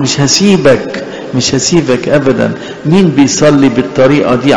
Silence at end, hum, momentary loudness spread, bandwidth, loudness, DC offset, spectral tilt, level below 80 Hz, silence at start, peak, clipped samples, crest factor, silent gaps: 0 s; none; 8 LU; 11 kHz; -9 LUFS; 0.9%; -4.5 dB/octave; -40 dBFS; 0 s; 0 dBFS; under 0.1%; 8 dB; none